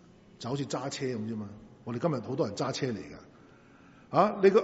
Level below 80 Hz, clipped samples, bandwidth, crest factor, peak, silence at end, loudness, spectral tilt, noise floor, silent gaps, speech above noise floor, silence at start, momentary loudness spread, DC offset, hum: -68 dBFS; under 0.1%; 8 kHz; 22 dB; -8 dBFS; 0 s; -31 LUFS; -5.5 dB/octave; -56 dBFS; none; 27 dB; 0.4 s; 18 LU; under 0.1%; none